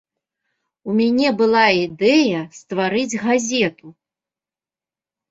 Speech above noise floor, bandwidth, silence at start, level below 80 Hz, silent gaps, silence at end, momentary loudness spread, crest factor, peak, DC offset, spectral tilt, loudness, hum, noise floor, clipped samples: over 72 dB; 8 kHz; 0.85 s; -62 dBFS; none; 1.4 s; 8 LU; 18 dB; -2 dBFS; under 0.1%; -4 dB/octave; -18 LUFS; none; under -90 dBFS; under 0.1%